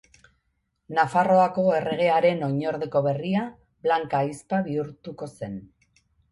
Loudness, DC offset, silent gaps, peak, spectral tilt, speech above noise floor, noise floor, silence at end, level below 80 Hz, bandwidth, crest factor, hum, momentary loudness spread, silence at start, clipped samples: -24 LUFS; under 0.1%; none; -8 dBFS; -7 dB/octave; 51 dB; -74 dBFS; 0.65 s; -64 dBFS; 11.5 kHz; 18 dB; none; 17 LU; 0.9 s; under 0.1%